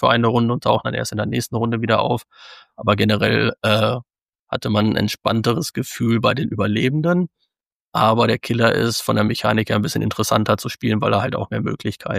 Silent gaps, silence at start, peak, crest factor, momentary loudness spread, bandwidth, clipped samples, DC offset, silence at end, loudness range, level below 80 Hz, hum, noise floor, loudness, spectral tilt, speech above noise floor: 4.22-4.26 s, 4.39-4.47 s, 7.67-7.89 s; 0 s; -2 dBFS; 18 dB; 7 LU; 15.5 kHz; under 0.1%; under 0.1%; 0 s; 2 LU; -52 dBFS; none; -75 dBFS; -19 LUFS; -5.5 dB/octave; 56 dB